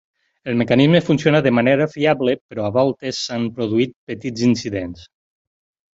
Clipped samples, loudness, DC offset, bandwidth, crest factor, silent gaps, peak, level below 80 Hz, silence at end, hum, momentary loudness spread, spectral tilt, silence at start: under 0.1%; -18 LUFS; under 0.1%; 8 kHz; 18 dB; 2.41-2.49 s, 3.96-4.07 s; -2 dBFS; -52 dBFS; 0.9 s; none; 12 LU; -6 dB/octave; 0.45 s